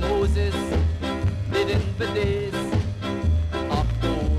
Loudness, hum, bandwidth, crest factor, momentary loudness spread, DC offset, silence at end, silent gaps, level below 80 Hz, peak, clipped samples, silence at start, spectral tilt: -24 LUFS; none; 12.5 kHz; 14 dB; 3 LU; under 0.1%; 0 s; none; -28 dBFS; -10 dBFS; under 0.1%; 0 s; -7 dB/octave